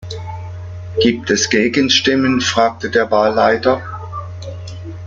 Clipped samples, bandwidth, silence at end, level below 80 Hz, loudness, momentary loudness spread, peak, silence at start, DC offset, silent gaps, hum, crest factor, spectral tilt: under 0.1%; 7.6 kHz; 0 s; -48 dBFS; -14 LUFS; 17 LU; 0 dBFS; 0 s; under 0.1%; none; none; 16 dB; -4 dB/octave